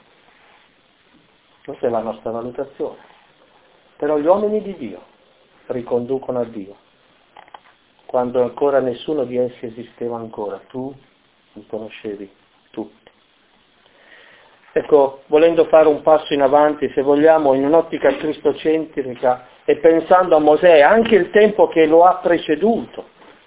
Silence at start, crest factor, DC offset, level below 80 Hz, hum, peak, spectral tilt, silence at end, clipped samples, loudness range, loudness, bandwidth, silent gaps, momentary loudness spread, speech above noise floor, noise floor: 1.7 s; 18 dB; under 0.1%; -56 dBFS; none; 0 dBFS; -9.5 dB/octave; 0.45 s; under 0.1%; 17 LU; -16 LUFS; 4 kHz; none; 19 LU; 40 dB; -56 dBFS